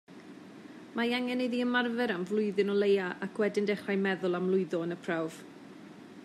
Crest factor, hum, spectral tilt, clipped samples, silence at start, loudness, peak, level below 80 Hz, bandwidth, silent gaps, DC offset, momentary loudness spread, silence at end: 16 dB; none; -6 dB/octave; under 0.1%; 0.1 s; -31 LUFS; -16 dBFS; -84 dBFS; 12.5 kHz; none; under 0.1%; 21 LU; 0 s